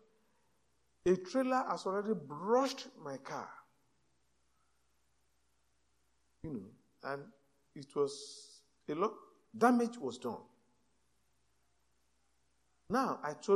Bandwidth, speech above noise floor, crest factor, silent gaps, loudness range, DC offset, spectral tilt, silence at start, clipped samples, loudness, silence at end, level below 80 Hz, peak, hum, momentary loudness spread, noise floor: 13.5 kHz; 44 dB; 24 dB; none; 16 LU; under 0.1%; -5.5 dB/octave; 1.05 s; under 0.1%; -36 LUFS; 0 s; -72 dBFS; -14 dBFS; none; 19 LU; -79 dBFS